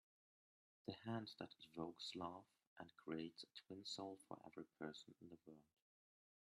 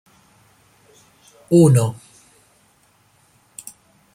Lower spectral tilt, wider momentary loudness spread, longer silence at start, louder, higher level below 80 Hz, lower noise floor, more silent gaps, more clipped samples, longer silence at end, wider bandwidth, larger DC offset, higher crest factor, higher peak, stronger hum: second, -5 dB/octave vs -7.5 dB/octave; second, 12 LU vs 28 LU; second, 0.85 s vs 1.5 s; second, -54 LUFS vs -15 LUFS; second, under -90 dBFS vs -60 dBFS; first, under -90 dBFS vs -58 dBFS; first, 2.67-2.76 s vs none; neither; second, 0.9 s vs 2.2 s; second, 13 kHz vs 16 kHz; neither; about the same, 22 dB vs 20 dB; second, -34 dBFS vs -2 dBFS; neither